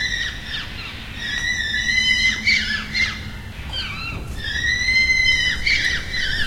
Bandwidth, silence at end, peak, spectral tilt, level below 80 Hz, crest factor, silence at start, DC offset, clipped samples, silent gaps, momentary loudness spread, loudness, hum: 16.5 kHz; 0 s; -6 dBFS; -1.5 dB/octave; -34 dBFS; 16 dB; 0 s; under 0.1%; under 0.1%; none; 14 LU; -19 LUFS; none